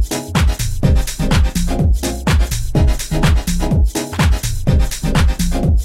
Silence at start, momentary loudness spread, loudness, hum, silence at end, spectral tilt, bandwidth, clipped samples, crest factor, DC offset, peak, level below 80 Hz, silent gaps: 0 s; 2 LU; -17 LUFS; none; 0 s; -5.5 dB/octave; 16.5 kHz; under 0.1%; 14 dB; under 0.1%; 0 dBFS; -16 dBFS; none